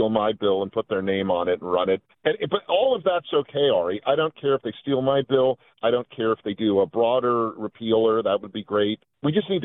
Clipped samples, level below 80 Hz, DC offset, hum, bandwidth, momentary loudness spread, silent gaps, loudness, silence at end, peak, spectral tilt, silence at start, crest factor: under 0.1%; -64 dBFS; under 0.1%; none; 4 kHz; 5 LU; none; -23 LUFS; 0 s; -6 dBFS; -10 dB/octave; 0 s; 16 dB